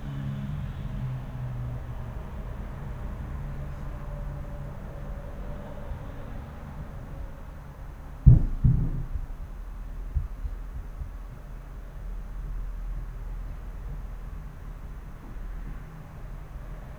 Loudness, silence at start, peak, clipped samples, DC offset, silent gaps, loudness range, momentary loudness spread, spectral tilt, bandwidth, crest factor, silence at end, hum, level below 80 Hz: -33 LUFS; 0 s; 0 dBFS; under 0.1%; under 0.1%; none; 14 LU; 14 LU; -9 dB/octave; 12.5 kHz; 30 dB; 0 s; none; -34 dBFS